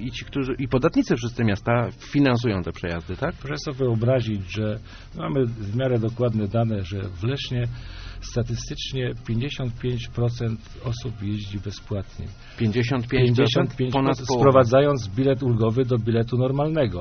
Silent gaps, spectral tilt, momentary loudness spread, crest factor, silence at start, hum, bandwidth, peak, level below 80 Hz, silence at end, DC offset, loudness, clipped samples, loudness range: none; -6.5 dB/octave; 12 LU; 20 dB; 0 s; none; 6.6 kHz; -4 dBFS; -42 dBFS; 0 s; under 0.1%; -24 LUFS; under 0.1%; 8 LU